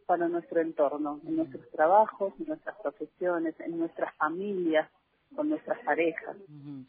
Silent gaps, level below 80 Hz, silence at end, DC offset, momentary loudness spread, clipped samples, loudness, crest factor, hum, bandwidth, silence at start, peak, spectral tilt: none; -76 dBFS; 0.05 s; under 0.1%; 13 LU; under 0.1%; -30 LUFS; 20 dB; none; 3.7 kHz; 0.1 s; -10 dBFS; -4.5 dB/octave